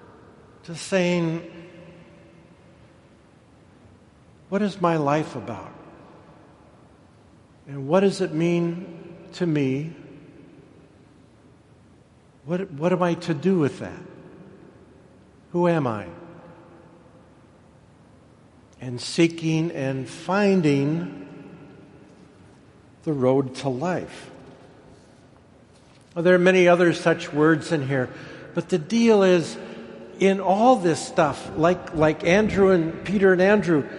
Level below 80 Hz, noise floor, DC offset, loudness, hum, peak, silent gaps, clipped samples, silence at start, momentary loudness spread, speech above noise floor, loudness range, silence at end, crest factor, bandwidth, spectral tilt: -56 dBFS; -54 dBFS; under 0.1%; -22 LUFS; none; -4 dBFS; none; under 0.1%; 0.7 s; 22 LU; 33 dB; 10 LU; 0 s; 20 dB; 11.5 kHz; -6.5 dB/octave